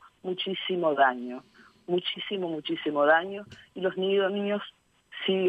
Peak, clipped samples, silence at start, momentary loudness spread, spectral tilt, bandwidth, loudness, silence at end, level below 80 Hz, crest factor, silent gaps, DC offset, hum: -8 dBFS; under 0.1%; 0.05 s; 18 LU; -7 dB/octave; 7.6 kHz; -28 LUFS; 0 s; -74 dBFS; 20 dB; none; under 0.1%; none